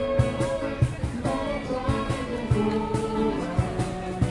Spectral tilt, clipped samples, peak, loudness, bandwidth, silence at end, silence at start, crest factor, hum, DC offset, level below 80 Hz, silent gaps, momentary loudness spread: -7 dB/octave; under 0.1%; -8 dBFS; -27 LUFS; 11.5 kHz; 0 s; 0 s; 18 dB; none; under 0.1%; -38 dBFS; none; 4 LU